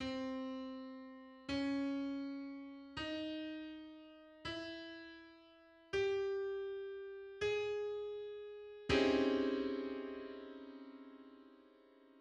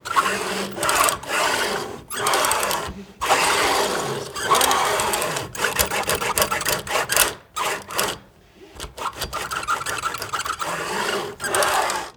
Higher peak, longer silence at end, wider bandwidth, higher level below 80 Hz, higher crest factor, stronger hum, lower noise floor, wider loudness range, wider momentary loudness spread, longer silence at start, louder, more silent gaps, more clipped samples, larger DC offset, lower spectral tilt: second, -22 dBFS vs 0 dBFS; about the same, 0 s vs 0.05 s; second, 9.2 kHz vs over 20 kHz; second, -66 dBFS vs -48 dBFS; about the same, 20 dB vs 24 dB; neither; first, -65 dBFS vs -48 dBFS; about the same, 8 LU vs 6 LU; first, 19 LU vs 9 LU; about the same, 0 s vs 0.05 s; second, -41 LUFS vs -21 LUFS; neither; neither; neither; first, -5.5 dB/octave vs -1.5 dB/octave